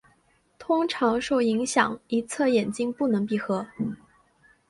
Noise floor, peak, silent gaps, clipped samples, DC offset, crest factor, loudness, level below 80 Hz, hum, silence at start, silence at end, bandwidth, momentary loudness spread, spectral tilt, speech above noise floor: -65 dBFS; -6 dBFS; none; under 0.1%; under 0.1%; 20 dB; -25 LUFS; -64 dBFS; none; 0.6 s; 0.75 s; 11.5 kHz; 9 LU; -4.5 dB/octave; 40 dB